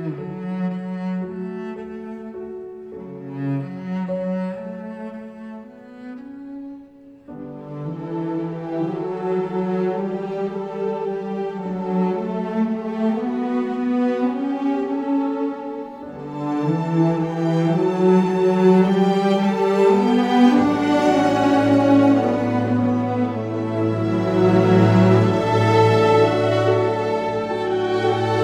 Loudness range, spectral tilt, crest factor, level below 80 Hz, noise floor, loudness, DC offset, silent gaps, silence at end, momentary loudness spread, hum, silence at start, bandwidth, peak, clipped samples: 13 LU; -8 dB/octave; 18 dB; -56 dBFS; -44 dBFS; -20 LUFS; under 0.1%; none; 0 s; 19 LU; none; 0 s; 10.5 kHz; -2 dBFS; under 0.1%